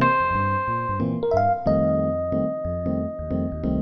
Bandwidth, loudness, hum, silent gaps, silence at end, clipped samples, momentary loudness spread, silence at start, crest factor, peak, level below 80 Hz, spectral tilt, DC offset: 6.2 kHz; -23 LUFS; none; none; 0 s; under 0.1%; 6 LU; 0 s; 16 dB; -8 dBFS; -40 dBFS; -9.5 dB/octave; under 0.1%